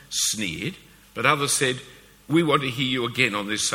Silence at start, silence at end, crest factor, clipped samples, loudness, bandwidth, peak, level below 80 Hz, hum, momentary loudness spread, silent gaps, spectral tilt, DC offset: 0.1 s; 0 s; 24 dB; under 0.1%; -23 LUFS; 17.5 kHz; -2 dBFS; -58 dBFS; none; 11 LU; none; -3 dB/octave; under 0.1%